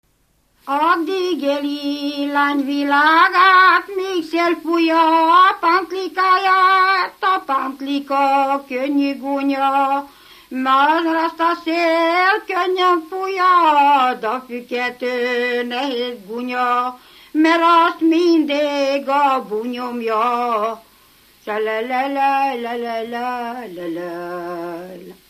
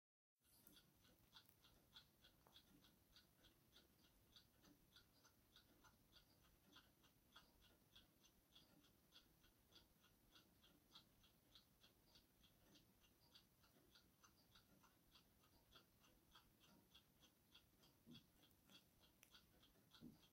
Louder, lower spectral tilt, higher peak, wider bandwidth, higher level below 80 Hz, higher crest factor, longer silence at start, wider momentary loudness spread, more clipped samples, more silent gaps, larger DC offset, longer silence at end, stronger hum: first, -17 LUFS vs -69 LUFS; about the same, -3.5 dB/octave vs -3 dB/octave; first, 0 dBFS vs -44 dBFS; about the same, 15 kHz vs 16 kHz; first, -66 dBFS vs -86 dBFS; second, 16 dB vs 30 dB; first, 0.65 s vs 0.35 s; first, 14 LU vs 2 LU; neither; neither; neither; first, 0.15 s vs 0 s; neither